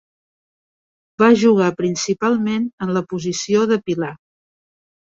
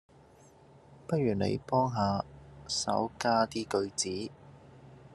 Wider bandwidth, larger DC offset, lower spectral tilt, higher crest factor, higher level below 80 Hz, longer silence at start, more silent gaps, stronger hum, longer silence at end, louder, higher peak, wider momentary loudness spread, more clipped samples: second, 7.8 kHz vs 12.5 kHz; neither; about the same, -5 dB/octave vs -4.5 dB/octave; about the same, 18 dB vs 20 dB; about the same, -60 dBFS vs -62 dBFS; first, 1.2 s vs 0.9 s; first, 2.73-2.78 s vs none; neither; first, 1 s vs 0 s; first, -18 LUFS vs -31 LUFS; first, -2 dBFS vs -12 dBFS; about the same, 11 LU vs 13 LU; neither